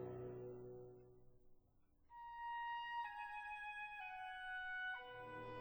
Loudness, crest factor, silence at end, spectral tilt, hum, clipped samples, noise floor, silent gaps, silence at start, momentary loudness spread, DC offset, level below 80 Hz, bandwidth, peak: -49 LUFS; 12 dB; 0 s; -5.5 dB/octave; none; under 0.1%; -74 dBFS; none; 0 s; 13 LU; under 0.1%; -74 dBFS; over 20 kHz; -38 dBFS